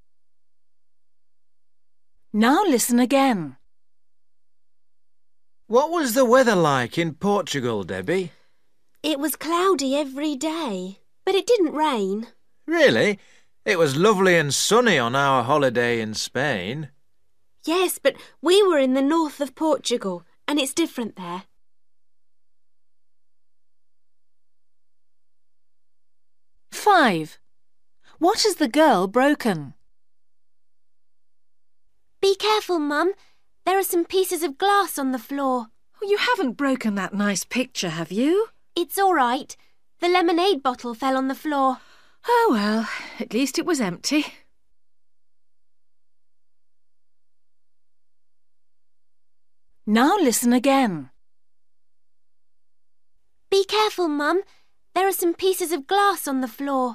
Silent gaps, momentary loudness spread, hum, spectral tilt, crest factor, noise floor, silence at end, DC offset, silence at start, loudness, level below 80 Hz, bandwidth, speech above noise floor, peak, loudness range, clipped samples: none; 12 LU; none; -4 dB/octave; 20 dB; -89 dBFS; 0 s; 0.2%; 2.35 s; -21 LUFS; -68 dBFS; 15.5 kHz; 68 dB; -4 dBFS; 7 LU; under 0.1%